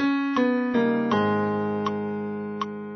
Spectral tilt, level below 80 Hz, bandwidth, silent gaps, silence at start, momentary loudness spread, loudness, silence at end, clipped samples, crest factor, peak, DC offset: -7.5 dB/octave; -62 dBFS; 6.4 kHz; none; 0 s; 8 LU; -25 LUFS; 0 s; under 0.1%; 14 dB; -10 dBFS; under 0.1%